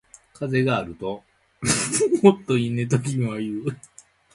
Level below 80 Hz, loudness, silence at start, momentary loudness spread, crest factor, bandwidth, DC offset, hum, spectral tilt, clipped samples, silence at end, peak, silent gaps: -54 dBFS; -23 LUFS; 0.4 s; 15 LU; 22 dB; 11.5 kHz; under 0.1%; none; -5 dB/octave; under 0.1%; 0.6 s; 0 dBFS; none